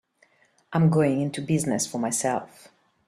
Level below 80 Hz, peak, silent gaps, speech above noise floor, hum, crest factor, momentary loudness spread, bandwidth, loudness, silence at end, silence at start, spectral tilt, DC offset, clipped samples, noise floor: -62 dBFS; -10 dBFS; none; 39 dB; none; 16 dB; 8 LU; 13.5 kHz; -25 LUFS; 0.6 s; 0.7 s; -5.5 dB/octave; under 0.1%; under 0.1%; -63 dBFS